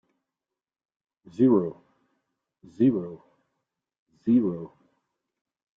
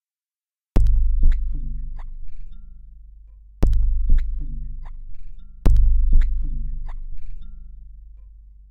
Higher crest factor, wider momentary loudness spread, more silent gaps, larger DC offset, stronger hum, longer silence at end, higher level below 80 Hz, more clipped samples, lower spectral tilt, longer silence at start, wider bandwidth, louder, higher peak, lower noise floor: about the same, 18 dB vs 20 dB; second, 19 LU vs 24 LU; first, 3.99-4.06 s vs none; neither; neither; first, 1.1 s vs 0.6 s; second, -70 dBFS vs -20 dBFS; neither; first, -10.5 dB/octave vs -8.5 dB/octave; first, 1.4 s vs 0.75 s; first, 3.8 kHz vs 2.3 kHz; about the same, -24 LUFS vs -25 LUFS; second, -10 dBFS vs 0 dBFS; about the same, under -90 dBFS vs under -90 dBFS